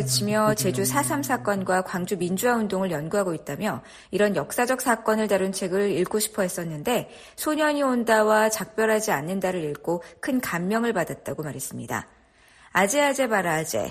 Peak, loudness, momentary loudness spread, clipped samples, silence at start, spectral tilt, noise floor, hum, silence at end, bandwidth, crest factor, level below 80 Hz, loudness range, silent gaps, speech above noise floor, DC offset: -8 dBFS; -24 LUFS; 9 LU; under 0.1%; 0 s; -4 dB/octave; -55 dBFS; none; 0 s; 14.5 kHz; 18 dB; -60 dBFS; 3 LU; none; 31 dB; under 0.1%